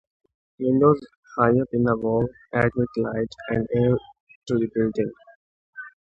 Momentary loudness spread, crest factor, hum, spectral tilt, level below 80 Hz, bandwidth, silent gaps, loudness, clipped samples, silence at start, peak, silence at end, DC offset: 9 LU; 20 dB; none; -9 dB/octave; -50 dBFS; 7.8 kHz; 1.17-1.23 s, 4.20-4.27 s, 4.35-4.42 s, 5.35-5.73 s; -23 LUFS; under 0.1%; 0.6 s; -4 dBFS; 0.15 s; under 0.1%